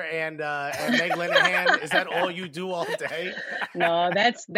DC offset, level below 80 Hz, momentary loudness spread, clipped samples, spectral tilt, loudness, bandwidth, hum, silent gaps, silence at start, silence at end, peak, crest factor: under 0.1%; -74 dBFS; 11 LU; under 0.1%; -3.5 dB/octave; -24 LUFS; 16 kHz; none; none; 0 s; 0 s; -6 dBFS; 18 dB